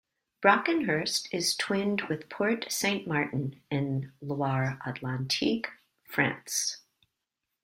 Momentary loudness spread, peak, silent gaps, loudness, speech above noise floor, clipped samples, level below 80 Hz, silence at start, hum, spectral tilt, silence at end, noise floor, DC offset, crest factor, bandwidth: 9 LU; -6 dBFS; none; -29 LUFS; 56 dB; under 0.1%; -68 dBFS; 0.4 s; none; -4 dB/octave; 0.85 s; -85 dBFS; under 0.1%; 24 dB; 16 kHz